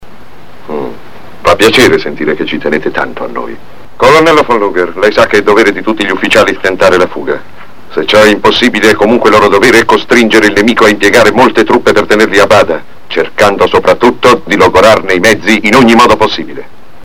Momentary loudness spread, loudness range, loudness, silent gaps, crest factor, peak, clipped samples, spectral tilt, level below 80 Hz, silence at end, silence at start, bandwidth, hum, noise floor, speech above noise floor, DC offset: 13 LU; 4 LU; -6 LUFS; none; 8 dB; 0 dBFS; 4%; -4 dB/octave; -36 dBFS; 0.4 s; 0 s; 17 kHz; none; -35 dBFS; 28 dB; 7%